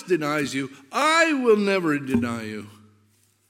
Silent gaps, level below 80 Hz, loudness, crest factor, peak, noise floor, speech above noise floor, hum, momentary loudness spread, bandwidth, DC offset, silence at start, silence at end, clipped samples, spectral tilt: none; -62 dBFS; -22 LUFS; 18 dB; -6 dBFS; -63 dBFS; 40 dB; none; 13 LU; 16 kHz; under 0.1%; 0 s; 0.8 s; under 0.1%; -4.5 dB/octave